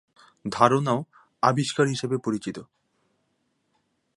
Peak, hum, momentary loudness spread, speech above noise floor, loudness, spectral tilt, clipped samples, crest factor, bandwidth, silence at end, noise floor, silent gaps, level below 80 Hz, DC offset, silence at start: -2 dBFS; none; 17 LU; 49 dB; -24 LUFS; -5.5 dB/octave; under 0.1%; 24 dB; 11.5 kHz; 1.55 s; -73 dBFS; none; -66 dBFS; under 0.1%; 0.45 s